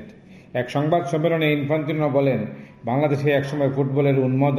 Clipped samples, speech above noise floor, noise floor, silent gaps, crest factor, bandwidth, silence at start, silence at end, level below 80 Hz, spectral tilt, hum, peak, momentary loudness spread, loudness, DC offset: under 0.1%; 24 dB; -45 dBFS; none; 14 dB; 14.5 kHz; 0 s; 0 s; -60 dBFS; -8 dB/octave; none; -6 dBFS; 8 LU; -21 LUFS; under 0.1%